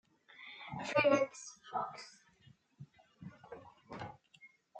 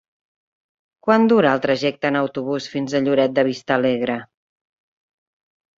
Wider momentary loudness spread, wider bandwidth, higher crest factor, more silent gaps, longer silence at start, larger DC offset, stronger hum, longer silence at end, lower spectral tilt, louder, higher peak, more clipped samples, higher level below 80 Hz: first, 28 LU vs 10 LU; first, 9 kHz vs 7.6 kHz; about the same, 24 dB vs 20 dB; neither; second, 0.4 s vs 1.05 s; neither; neither; second, 0 s vs 1.55 s; second, -4.5 dB/octave vs -6 dB/octave; second, -36 LUFS vs -19 LUFS; second, -16 dBFS vs -2 dBFS; neither; second, -78 dBFS vs -64 dBFS